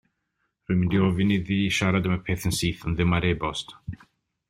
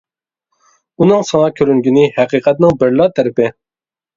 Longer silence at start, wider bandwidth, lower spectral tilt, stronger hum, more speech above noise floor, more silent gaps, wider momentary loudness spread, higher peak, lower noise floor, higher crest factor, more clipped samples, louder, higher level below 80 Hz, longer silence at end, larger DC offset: second, 0.7 s vs 1 s; first, 16 kHz vs 7.6 kHz; second, -5.5 dB/octave vs -7 dB/octave; neither; second, 52 dB vs over 79 dB; neither; first, 14 LU vs 4 LU; second, -8 dBFS vs 0 dBFS; second, -76 dBFS vs under -90 dBFS; about the same, 18 dB vs 14 dB; neither; second, -25 LUFS vs -12 LUFS; about the same, -46 dBFS vs -50 dBFS; about the same, 0.55 s vs 0.65 s; neither